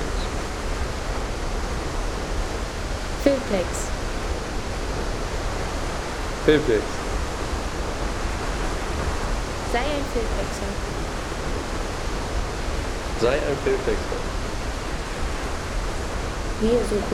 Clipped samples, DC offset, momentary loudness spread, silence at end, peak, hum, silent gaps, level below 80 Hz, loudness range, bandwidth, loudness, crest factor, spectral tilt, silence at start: under 0.1%; under 0.1%; 7 LU; 0 s; -4 dBFS; none; none; -30 dBFS; 2 LU; 15 kHz; -26 LUFS; 20 dB; -5 dB/octave; 0 s